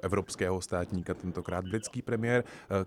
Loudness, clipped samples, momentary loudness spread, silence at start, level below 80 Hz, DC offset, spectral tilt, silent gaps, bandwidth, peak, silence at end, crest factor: -33 LUFS; under 0.1%; 6 LU; 0 s; -56 dBFS; under 0.1%; -5.5 dB/octave; none; 14.5 kHz; -14 dBFS; 0 s; 18 dB